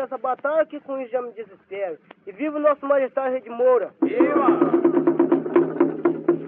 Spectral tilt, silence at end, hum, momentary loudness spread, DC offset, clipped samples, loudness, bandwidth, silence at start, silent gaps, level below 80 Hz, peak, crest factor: -6.5 dB/octave; 0 s; none; 13 LU; under 0.1%; under 0.1%; -21 LUFS; 3.6 kHz; 0 s; none; -76 dBFS; -4 dBFS; 16 dB